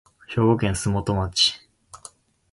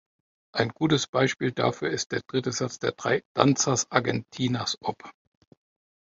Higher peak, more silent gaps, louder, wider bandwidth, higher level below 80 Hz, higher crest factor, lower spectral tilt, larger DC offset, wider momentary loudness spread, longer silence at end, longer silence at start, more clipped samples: second, -6 dBFS vs -2 dBFS; second, none vs 1.09-1.13 s, 2.06-2.10 s, 3.25-3.35 s; first, -22 LUFS vs -26 LUFS; first, 11.5 kHz vs 7.8 kHz; first, -42 dBFS vs -62 dBFS; second, 20 dB vs 26 dB; about the same, -4.5 dB/octave vs -4 dB/octave; neither; first, 23 LU vs 7 LU; second, 0.55 s vs 1 s; second, 0.3 s vs 0.55 s; neither